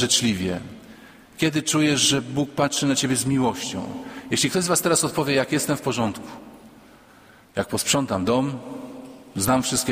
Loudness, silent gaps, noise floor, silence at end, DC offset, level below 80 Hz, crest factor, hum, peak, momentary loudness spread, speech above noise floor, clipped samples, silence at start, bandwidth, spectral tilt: -22 LUFS; none; -51 dBFS; 0 s; under 0.1%; -54 dBFS; 20 dB; none; -4 dBFS; 17 LU; 28 dB; under 0.1%; 0 s; 16 kHz; -3.5 dB/octave